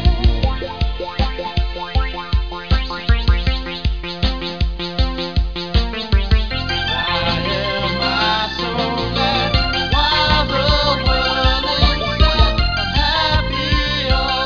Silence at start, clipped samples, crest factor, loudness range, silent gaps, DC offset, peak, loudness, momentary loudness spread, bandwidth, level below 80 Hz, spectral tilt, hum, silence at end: 0 s; under 0.1%; 16 dB; 5 LU; none; 0.9%; 0 dBFS; -18 LUFS; 7 LU; 5.4 kHz; -20 dBFS; -5.5 dB/octave; none; 0 s